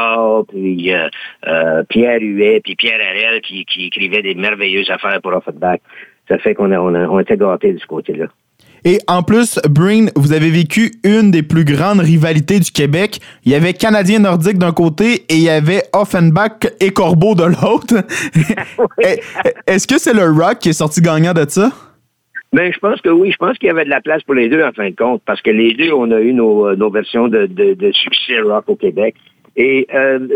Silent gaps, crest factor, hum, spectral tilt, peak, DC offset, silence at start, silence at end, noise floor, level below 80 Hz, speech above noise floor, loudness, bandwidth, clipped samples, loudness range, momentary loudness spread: none; 12 dB; none; -5.5 dB/octave; 0 dBFS; under 0.1%; 0 s; 0 s; -48 dBFS; -50 dBFS; 36 dB; -13 LUFS; 16.5 kHz; under 0.1%; 4 LU; 6 LU